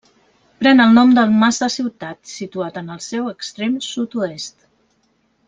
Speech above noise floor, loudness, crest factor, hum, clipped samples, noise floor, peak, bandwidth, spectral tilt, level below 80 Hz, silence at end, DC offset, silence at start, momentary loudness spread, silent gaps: 46 dB; -16 LUFS; 16 dB; none; under 0.1%; -63 dBFS; -2 dBFS; 9.4 kHz; -4.5 dB/octave; -60 dBFS; 1 s; under 0.1%; 0.6 s; 20 LU; none